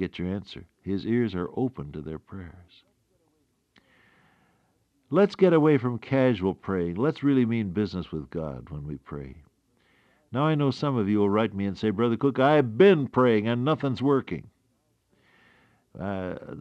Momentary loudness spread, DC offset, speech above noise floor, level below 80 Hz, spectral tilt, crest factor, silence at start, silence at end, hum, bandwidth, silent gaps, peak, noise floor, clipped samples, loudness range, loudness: 18 LU; under 0.1%; 46 dB; -56 dBFS; -8.5 dB/octave; 20 dB; 0 s; 0 s; none; 8 kHz; none; -8 dBFS; -71 dBFS; under 0.1%; 10 LU; -25 LUFS